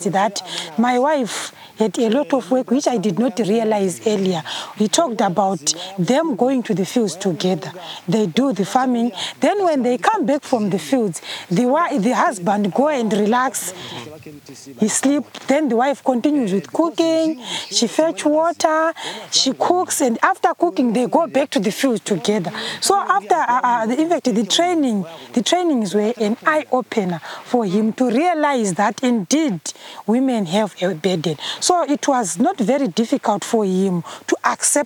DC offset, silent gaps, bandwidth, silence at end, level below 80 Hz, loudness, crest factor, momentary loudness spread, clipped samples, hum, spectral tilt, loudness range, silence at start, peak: under 0.1%; none; 19 kHz; 0 s; -72 dBFS; -18 LUFS; 18 dB; 6 LU; under 0.1%; none; -4 dB/octave; 2 LU; 0 s; 0 dBFS